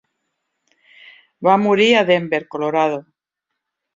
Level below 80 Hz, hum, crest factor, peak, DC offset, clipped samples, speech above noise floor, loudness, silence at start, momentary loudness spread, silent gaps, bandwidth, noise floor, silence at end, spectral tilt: -66 dBFS; none; 18 dB; -2 dBFS; under 0.1%; under 0.1%; 64 dB; -16 LUFS; 1.4 s; 8 LU; none; 7.6 kHz; -80 dBFS; 0.95 s; -5.5 dB/octave